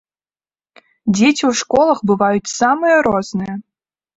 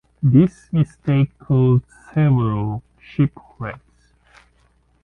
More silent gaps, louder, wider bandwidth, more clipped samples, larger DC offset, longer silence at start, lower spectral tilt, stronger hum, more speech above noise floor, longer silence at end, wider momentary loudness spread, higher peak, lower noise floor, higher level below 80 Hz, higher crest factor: neither; first, -15 LUFS vs -19 LUFS; first, 8 kHz vs 3.8 kHz; neither; neither; first, 1.05 s vs 0.2 s; second, -4.5 dB/octave vs -10 dB/octave; second, none vs 60 Hz at -40 dBFS; first, over 75 dB vs 41 dB; second, 0.55 s vs 1.3 s; second, 11 LU vs 16 LU; about the same, -2 dBFS vs -2 dBFS; first, under -90 dBFS vs -59 dBFS; second, -52 dBFS vs -46 dBFS; about the same, 16 dB vs 18 dB